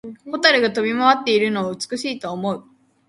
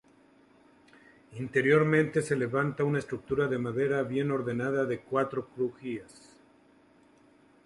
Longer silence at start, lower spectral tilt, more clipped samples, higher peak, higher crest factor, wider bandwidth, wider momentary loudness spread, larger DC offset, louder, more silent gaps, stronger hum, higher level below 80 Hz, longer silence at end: second, 0.05 s vs 1.3 s; second, -4 dB/octave vs -7 dB/octave; neither; first, 0 dBFS vs -12 dBFS; about the same, 20 dB vs 20 dB; about the same, 11.5 kHz vs 11.5 kHz; about the same, 11 LU vs 11 LU; neither; first, -19 LUFS vs -29 LUFS; neither; neither; about the same, -66 dBFS vs -66 dBFS; second, 0.5 s vs 1.6 s